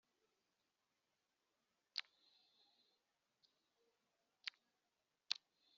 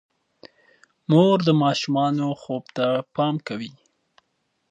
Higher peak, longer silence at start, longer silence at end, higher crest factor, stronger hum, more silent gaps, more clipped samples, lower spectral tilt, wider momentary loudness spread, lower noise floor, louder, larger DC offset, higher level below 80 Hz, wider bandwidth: second, -18 dBFS vs -4 dBFS; first, 1.95 s vs 1.1 s; second, 0.45 s vs 1 s; first, 40 dB vs 20 dB; neither; neither; neither; second, 6 dB/octave vs -7 dB/octave; second, 6 LU vs 15 LU; first, -90 dBFS vs -73 dBFS; second, -50 LUFS vs -22 LUFS; neither; second, under -90 dBFS vs -70 dBFS; second, 6.8 kHz vs 8.8 kHz